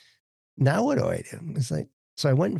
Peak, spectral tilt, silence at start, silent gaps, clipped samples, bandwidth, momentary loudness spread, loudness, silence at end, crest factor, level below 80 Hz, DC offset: -8 dBFS; -6.5 dB/octave; 0.55 s; 1.93-2.17 s; under 0.1%; 12.5 kHz; 10 LU; -26 LUFS; 0 s; 18 dB; -60 dBFS; under 0.1%